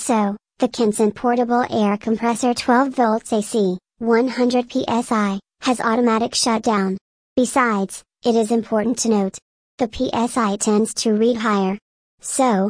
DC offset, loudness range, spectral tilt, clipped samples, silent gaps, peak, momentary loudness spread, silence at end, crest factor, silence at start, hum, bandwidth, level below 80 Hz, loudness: under 0.1%; 2 LU; -4.5 dB/octave; under 0.1%; 7.01-7.36 s, 9.42-9.78 s, 11.82-12.18 s; -4 dBFS; 7 LU; 0 s; 16 dB; 0 s; none; 10.5 kHz; -54 dBFS; -19 LUFS